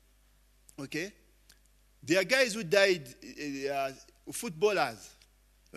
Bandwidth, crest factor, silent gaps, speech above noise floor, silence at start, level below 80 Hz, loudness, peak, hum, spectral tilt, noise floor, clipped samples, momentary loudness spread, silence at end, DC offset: 13.5 kHz; 24 dB; none; 34 dB; 0.8 s; -66 dBFS; -30 LUFS; -8 dBFS; 50 Hz at -65 dBFS; -3.5 dB/octave; -65 dBFS; under 0.1%; 21 LU; 0 s; under 0.1%